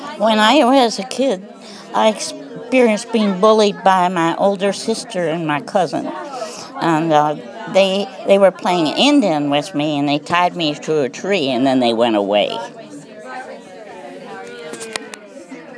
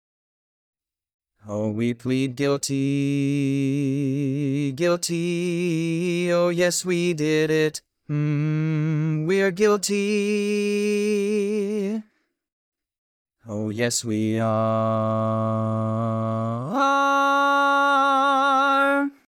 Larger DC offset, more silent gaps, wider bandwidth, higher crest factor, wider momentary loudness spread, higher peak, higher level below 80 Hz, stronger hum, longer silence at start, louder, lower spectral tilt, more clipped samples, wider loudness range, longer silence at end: neither; second, none vs 12.53-12.72 s, 12.98-13.25 s; second, 11 kHz vs 18.5 kHz; about the same, 16 dB vs 16 dB; first, 20 LU vs 7 LU; first, 0 dBFS vs -8 dBFS; about the same, -72 dBFS vs -70 dBFS; neither; second, 0 s vs 1.45 s; first, -16 LUFS vs -22 LUFS; about the same, -4.5 dB/octave vs -5.5 dB/octave; neither; about the same, 4 LU vs 6 LU; second, 0 s vs 0.2 s